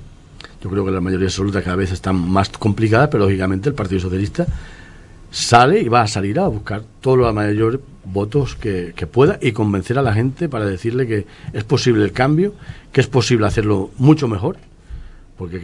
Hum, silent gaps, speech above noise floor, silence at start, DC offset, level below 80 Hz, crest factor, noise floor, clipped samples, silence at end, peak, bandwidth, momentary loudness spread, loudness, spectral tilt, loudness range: none; none; 23 dB; 0 s; under 0.1%; -38 dBFS; 18 dB; -40 dBFS; under 0.1%; 0 s; 0 dBFS; 11.5 kHz; 10 LU; -17 LUFS; -6.5 dB/octave; 2 LU